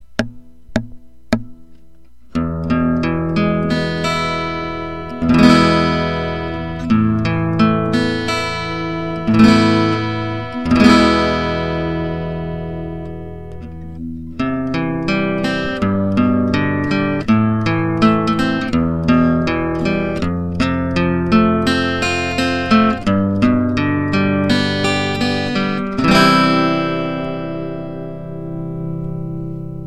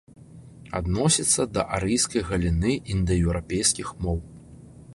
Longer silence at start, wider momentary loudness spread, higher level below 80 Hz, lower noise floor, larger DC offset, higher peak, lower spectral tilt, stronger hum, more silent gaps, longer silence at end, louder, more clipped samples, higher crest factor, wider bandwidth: second, 0.2 s vs 0.35 s; first, 14 LU vs 9 LU; about the same, -36 dBFS vs -36 dBFS; about the same, -49 dBFS vs -46 dBFS; first, 1% vs under 0.1%; first, 0 dBFS vs -6 dBFS; first, -6.5 dB/octave vs -4 dB/octave; neither; neither; about the same, 0 s vs 0 s; first, -17 LUFS vs -24 LUFS; neither; about the same, 16 dB vs 20 dB; about the same, 12.5 kHz vs 12 kHz